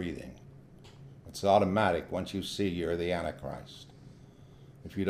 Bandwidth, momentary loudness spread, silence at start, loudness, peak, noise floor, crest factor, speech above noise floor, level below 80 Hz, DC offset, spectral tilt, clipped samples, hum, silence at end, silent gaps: 15.5 kHz; 26 LU; 0 s; -31 LUFS; -12 dBFS; -54 dBFS; 22 dB; 23 dB; -56 dBFS; under 0.1%; -6 dB/octave; under 0.1%; none; 0 s; none